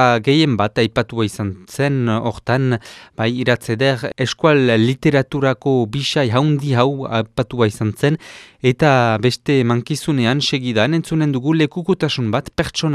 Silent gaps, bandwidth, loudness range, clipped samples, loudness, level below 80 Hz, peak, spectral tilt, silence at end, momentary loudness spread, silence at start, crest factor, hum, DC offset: none; 14 kHz; 3 LU; under 0.1%; -17 LUFS; -48 dBFS; 0 dBFS; -6 dB/octave; 0 s; 7 LU; 0 s; 16 dB; none; under 0.1%